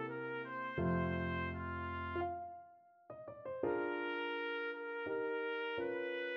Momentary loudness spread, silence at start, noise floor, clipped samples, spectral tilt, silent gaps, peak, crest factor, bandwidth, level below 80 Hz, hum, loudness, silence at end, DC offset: 11 LU; 0 s; -62 dBFS; under 0.1%; -5 dB/octave; none; -24 dBFS; 18 dB; 6 kHz; -62 dBFS; none; -40 LUFS; 0 s; under 0.1%